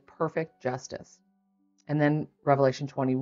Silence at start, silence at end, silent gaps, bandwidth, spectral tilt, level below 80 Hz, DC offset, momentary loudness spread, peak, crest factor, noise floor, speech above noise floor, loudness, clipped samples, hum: 0.2 s; 0 s; none; 7.6 kHz; -7 dB/octave; -72 dBFS; under 0.1%; 13 LU; -8 dBFS; 22 dB; -70 dBFS; 42 dB; -28 LUFS; under 0.1%; none